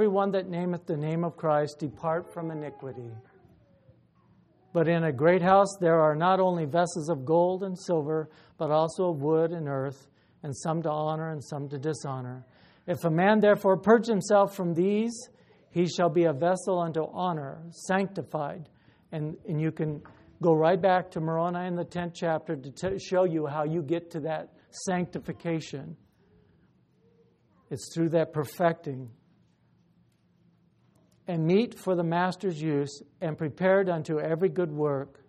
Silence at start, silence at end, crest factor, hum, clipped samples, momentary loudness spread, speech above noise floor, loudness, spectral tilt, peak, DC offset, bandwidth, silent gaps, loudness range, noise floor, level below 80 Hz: 0 s; 0.2 s; 22 dB; none; under 0.1%; 14 LU; 38 dB; -28 LUFS; -6.5 dB/octave; -6 dBFS; under 0.1%; 13 kHz; none; 9 LU; -65 dBFS; -68 dBFS